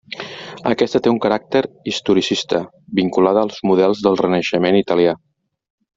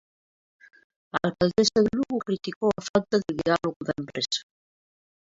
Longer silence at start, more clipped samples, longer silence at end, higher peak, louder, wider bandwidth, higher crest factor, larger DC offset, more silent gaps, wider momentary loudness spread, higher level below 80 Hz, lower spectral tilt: second, 0.1 s vs 1.15 s; neither; about the same, 0.8 s vs 0.9 s; first, -2 dBFS vs -8 dBFS; first, -17 LUFS vs -26 LUFS; about the same, 7.8 kHz vs 7.8 kHz; about the same, 16 dB vs 20 dB; neither; second, none vs 2.56-2.61 s, 2.89-2.94 s, 3.76-3.80 s; about the same, 8 LU vs 9 LU; about the same, -56 dBFS vs -58 dBFS; about the same, -5.5 dB/octave vs -4.5 dB/octave